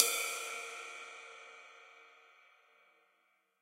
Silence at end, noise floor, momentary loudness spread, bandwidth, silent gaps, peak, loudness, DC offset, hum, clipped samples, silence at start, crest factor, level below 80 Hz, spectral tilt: 1.35 s; -76 dBFS; 23 LU; 16 kHz; none; -6 dBFS; -38 LUFS; under 0.1%; none; under 0.1%; 0 s; 36 dB; -88 dBFS; 3.5 dB/octave